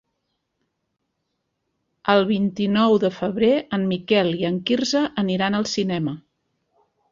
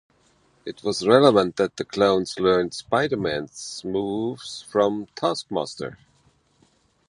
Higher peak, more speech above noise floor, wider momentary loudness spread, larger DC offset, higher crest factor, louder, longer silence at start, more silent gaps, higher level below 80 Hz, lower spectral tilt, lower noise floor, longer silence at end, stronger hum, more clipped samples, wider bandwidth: about the same, -4 dBFS vs -2 dBFS; first, 56 dB vs 40 dB; second, 6 LU vs 16 LU; neither; about the same, 20 dB vs 22 dB; about the same, -21 LUFS vs -23 LUFS; first, 2.05 s vs 0.65 s; neither; about the same, -60 dBFS vs -58 dBFS; about the same, -5.5 dB/octave vs -5 dB/octave; first, -76 dBFS vs -62 dBFS; second, 0.95 s vs 1.15 s; neither; neither; second, 7.6 kHz vs 11 kHz